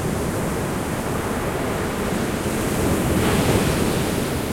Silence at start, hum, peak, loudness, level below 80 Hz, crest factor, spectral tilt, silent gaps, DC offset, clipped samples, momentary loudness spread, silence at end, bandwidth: 0 s; none; -6 dBFS; -22 LUFS; -34 dBFS; 16 dB; -5 dB/octave; none; under 0.1%; under 0.1%; 5 LU; 0 s; 16.5 kHz